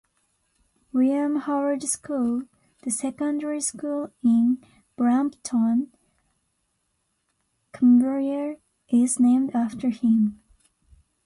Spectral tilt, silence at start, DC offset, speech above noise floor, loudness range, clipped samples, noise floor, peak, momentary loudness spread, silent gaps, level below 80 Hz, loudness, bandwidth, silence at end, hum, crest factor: -5 dB/octave; 0.95 s; under 0.1%; 52 dB; 4 LU; under 0.1%; -74 dBFS; -10 dBFS; 11 LU; none; -66 dBFS; -23 LUFS; 11.5 kHz; 0.9 s; none; 14 dB